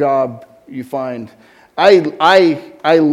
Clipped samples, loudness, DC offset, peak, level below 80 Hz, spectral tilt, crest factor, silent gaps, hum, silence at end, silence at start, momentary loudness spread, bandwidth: 0.2%; -13 LUFS; under 0.1%; 0 dBFS; -60 dBFS; -5.5 dB/octave; 14 dB; none; none; 0 s; 0 s; 19 LU; 13.5 kHz